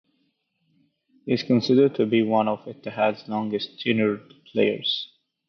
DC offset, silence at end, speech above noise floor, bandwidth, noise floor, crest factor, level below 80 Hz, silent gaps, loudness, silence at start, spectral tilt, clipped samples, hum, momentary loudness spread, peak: under 0.1%; 0.4 s; 49 dB; 6.4 kHz; -71 dBFS; 16 dB; -70 dBFS; none; -23 LUFS; 1.25 s; -7 dB/octave; under 0.1%; none; 12 LU; -8 dBFS